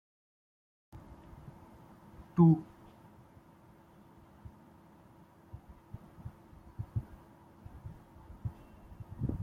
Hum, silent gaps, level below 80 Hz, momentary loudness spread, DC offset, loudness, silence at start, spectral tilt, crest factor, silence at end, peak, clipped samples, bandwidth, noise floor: none; none; -56 dBFS; 28 LU; under 0.1%; -32 LUFS; 0.95 s; -11 dB/octave; 26 dB; 0 s; -12 dBFS; under 0.1%; 3.3 kHz; -59 dBFS